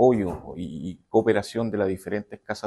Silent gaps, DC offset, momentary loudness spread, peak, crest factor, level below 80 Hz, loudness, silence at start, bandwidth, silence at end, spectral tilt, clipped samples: none; under 0.1%; 13 LU; -6 dBFS; 18 dB; -52 dBFS; -26 LUFS; 0 s; 12.5 kHz; 0 s; -7 dB/octave; under 0.1%